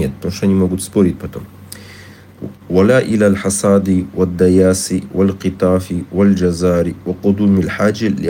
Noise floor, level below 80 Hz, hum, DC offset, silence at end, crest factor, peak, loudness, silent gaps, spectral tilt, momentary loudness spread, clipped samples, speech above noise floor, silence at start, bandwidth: -38 dBFS; -46 dBFS; none; under 0.1%; 0 s; 14 dB; 0 dBFS; -14 LUFS; none; -6.5 dB/octave; 18 LU; under 0.1%; 24 dB; 0 s; 17 kHz